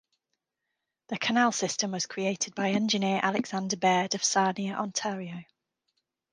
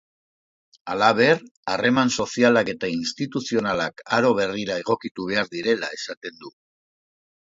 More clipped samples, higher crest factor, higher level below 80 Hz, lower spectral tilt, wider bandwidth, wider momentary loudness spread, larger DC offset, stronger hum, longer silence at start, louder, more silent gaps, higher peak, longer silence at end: neither; about the same, 20 dB vs 22 dB; second, -76 dBFS vs -62 dBFS; second, -3 dB/octave vs -4.5 dB/octave; first, 11 kHz vs 7.8 kHz; second, 8 LU vs 12 LU; neither; neither; first, 1.1 s vs 0.85 s; second, -28 LUFS vs -22 LUFS; second, none vs 1.51-1.63 s, 5.11-5.15 s, 6.17-6.21 s; second, -10 dBFS vs -2 dBFS; second, 0.9 s vs 1.1 s